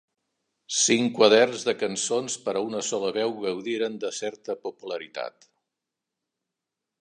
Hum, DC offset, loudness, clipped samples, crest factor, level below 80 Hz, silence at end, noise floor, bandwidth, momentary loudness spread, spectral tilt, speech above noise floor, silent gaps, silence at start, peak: none; under 0.1%; -25 LUFS; under 0.1%; 22 dB; -78 dBFS; 1.7 s; -86 dBFS; 11 kHz; 15 LU; -2.5 dB/octave; 61 dB; none; 0.7 s; -4 dBFS